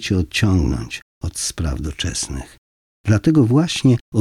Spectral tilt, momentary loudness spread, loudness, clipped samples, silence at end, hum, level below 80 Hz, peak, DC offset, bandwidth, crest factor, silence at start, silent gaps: -5.5 dB/octave; 14 LU; -19 LUFS; under 0.1%; 0 s; none; -34 dBFS; -4 dBFS; under 0.1%; 14.5 kHz; 14 dB; 0 s; 1.02-1.21 s, 2.58-3.04 s, 4.01-4.12 s